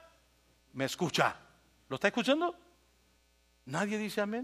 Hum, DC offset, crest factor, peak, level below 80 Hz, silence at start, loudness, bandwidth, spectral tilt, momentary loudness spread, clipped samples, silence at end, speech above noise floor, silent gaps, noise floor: 60 Hz at -65 dBFS; under 0.1%; 24 dB; -12 dBFS; -72 dBFS; 0.75 s; -33 LUFS; 15.5 kHz; -4.5 dB/octave; 16 LU; under 0.1%; 0 s; 37 dB; none; -69 dBFS